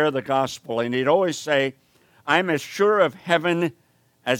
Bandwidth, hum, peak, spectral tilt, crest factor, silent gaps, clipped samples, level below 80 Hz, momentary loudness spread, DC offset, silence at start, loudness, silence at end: 18 kHz; none; -2 dBFS; -4.5 dB/octave; 20 dB; none; under 0.1%; -72 dBFS; 8 LU; under 0.1%; 0 s; -22 LUFS; 0 s